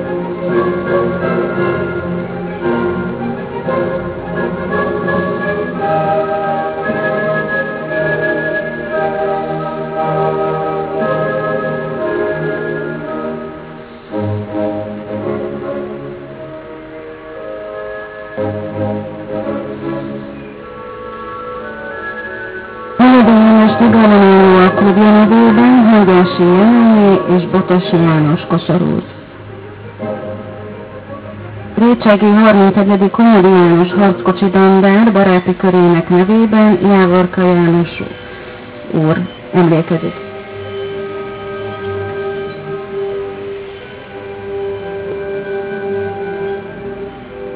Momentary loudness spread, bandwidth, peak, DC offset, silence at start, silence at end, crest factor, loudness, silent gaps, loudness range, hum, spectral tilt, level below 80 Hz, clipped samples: 21 LU; 4 kHz; 0 dBFS; under 0.1%; 0 s; 0 s; 12 dB; -12 LUFS; none; 15 LU; none; -11.5 dB/octave; -44 dBFS; under 0.1%